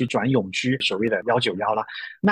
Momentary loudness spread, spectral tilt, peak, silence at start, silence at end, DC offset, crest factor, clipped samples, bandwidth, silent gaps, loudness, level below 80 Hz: 4 LU; -5.5 dB/octave; -8 dBFS; 0 s; 0 s; under 0.1%; 14 dB; under 0.1%; 10 kHz; none; -23 LUFS; -60 dBFS